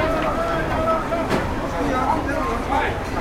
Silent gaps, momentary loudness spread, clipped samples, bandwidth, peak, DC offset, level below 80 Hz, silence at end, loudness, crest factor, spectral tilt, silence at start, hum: none; 3 LU; under 0.1%; 16.5 kHz; -8 dBFS; under 0.1%; -32 dBFS; 0 s; -22 LUFS; 14 dB; -6 dB/octave; 0 s; none